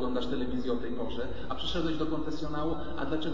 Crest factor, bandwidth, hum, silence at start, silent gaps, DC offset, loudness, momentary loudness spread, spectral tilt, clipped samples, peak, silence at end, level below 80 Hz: 14 dB; 7.6 kHz; none; 0 s; none; 3%; -34 LUFS; 4 LU; -6.5 dB/octave; under 0.1%; -18 dBFS; 0 s; -46 dBFS